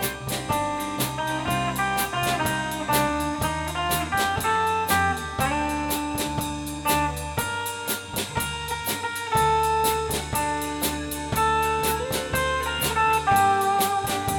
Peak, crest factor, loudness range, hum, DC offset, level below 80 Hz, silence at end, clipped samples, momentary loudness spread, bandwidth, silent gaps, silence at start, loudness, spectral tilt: -8 dBFS; 16 dB; 3 LU; none; under 0.1%; -40 dBFS; 0 s; under 0.1%; 6 LU; 19.5 kHz; none; 0 s; -24 LUFS; -3.5 dB/octave